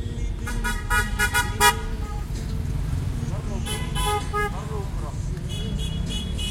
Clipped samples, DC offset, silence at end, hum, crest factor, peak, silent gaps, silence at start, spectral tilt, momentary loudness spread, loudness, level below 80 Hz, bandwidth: under 0.1%; under 0.1%; 0 s; none; 22 dB; -4 dBFS; none; 0 s; -4 dB/octave; 11 LU; -26 LUFS; -30 dBFS; 16.5 kHz